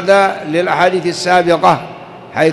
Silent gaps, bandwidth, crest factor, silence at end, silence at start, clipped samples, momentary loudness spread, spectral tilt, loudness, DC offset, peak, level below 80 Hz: none; 12 kHz; 12 dB; 0 s; 0 s; under 0.1%; 13 LU; -5 dB/octave; -13 LUFS; under 0.1%; 0 dBFS; -52 dBFS